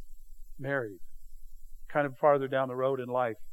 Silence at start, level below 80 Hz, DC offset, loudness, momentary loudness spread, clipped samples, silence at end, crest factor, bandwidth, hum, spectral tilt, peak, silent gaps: 0 s; -50 dBFS; under 0.1%; -30 LUFS; 8 LU; under 0.1%; 0 s; 20 dB; 16.5 kHz; none; -7.5 dB/octave; -12 dBFS; none